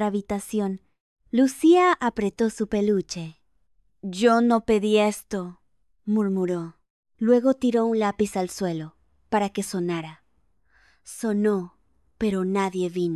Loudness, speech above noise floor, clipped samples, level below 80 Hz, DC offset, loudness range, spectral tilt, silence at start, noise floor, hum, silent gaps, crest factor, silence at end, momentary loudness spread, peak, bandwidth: -24 LUFS; 46 dB; under 0.1%; -58 dBFS; under 0.1%; 6 LU; -6 dB/octave; 0 s; -69 dBFS; none; 1.00-1.16 s, 6.90-7.03 s; 18 dB; 0 s; 15 LU; -6 dBFS; 13 kHz